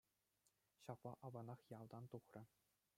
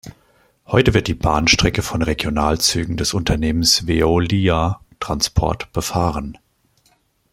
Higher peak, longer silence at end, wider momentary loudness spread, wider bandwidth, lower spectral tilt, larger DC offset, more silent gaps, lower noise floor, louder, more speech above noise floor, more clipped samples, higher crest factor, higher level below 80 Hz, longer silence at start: second, -36 dBFS vs 0 dBFS; second, 0.5 s vs 1 s; about the same, 8 LU vs 8 LU; about the same, 16 kHz vs 16.5 kHz; first, -7.5 dB/octave vs -4 dB/octave; neither; neither; first, -86 dBFS vs -60 dBFS; second, -58 LUFS vs -18 LUFS; second, 29 dB vs 43 dB; neither; about the same, 22 dB vs 18 dB; second, under -90 dBFS vs -32 dBFS; first, 0.8 s vs 0.05 s